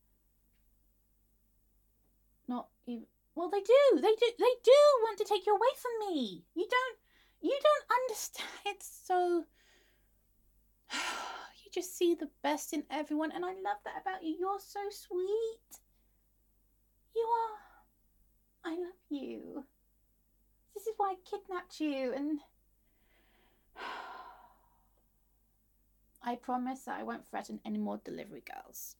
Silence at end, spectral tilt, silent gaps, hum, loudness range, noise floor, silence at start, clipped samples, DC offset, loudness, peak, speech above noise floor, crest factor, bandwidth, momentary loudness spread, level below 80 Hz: 0.1 s; -3 dB/octave; none; none; 17 LU; -72 dBFS; 2.5 s; under 0.1%; under 0.1%; -33 LUFS; -12 dBFS; 39 dB; 22 dB; 17.5 kHz; 18 LU; -74 dBFS